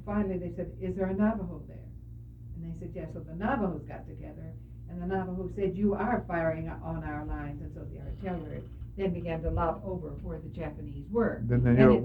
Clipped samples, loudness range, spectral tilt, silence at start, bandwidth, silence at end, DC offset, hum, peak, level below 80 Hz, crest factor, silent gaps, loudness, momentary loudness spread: under 0.1%; 4 LU; -10.5 dB/octave; 0 s; 4.8 kHz; 0 s; under 0.1%; none; -8 dBFS; -44 dBFS; 24 dB; none; -32 LUFS; 15 LU